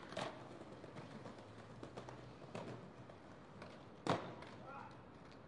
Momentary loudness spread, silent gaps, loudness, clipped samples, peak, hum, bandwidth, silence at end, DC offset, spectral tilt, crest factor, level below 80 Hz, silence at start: 15 LU; none; -51 LUFS; under 0.1%; -22 dBFS; none; 11 kHz; 0 s; under 0.1%; -5.5 dB/octave; 28 dB; -76 dBFS; 0 s